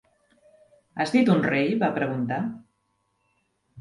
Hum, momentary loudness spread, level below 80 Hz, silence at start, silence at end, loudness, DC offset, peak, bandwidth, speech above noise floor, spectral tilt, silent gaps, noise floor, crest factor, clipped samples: none; 14 LU; -66 dBFS; 0.95 s; 0 s; -24 LUFS; under 0.1%; -8 dBFS; 11 kHz; 50 dB; -7 dB/octave; none; -73 dBFS; 18 dB; under 0.1%